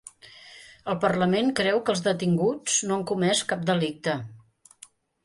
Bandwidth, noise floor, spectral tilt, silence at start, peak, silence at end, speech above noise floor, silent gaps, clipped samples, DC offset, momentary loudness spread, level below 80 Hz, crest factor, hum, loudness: 11.5 kHz; -54 dBFS; -4 dB/octave; 0.25 s; -8 dBFS; 0.85 s; 29 dB; none; under 0.1%; under 0.1%; 20 LU; -66 dBFS; 18 dB; none; -25 LUFS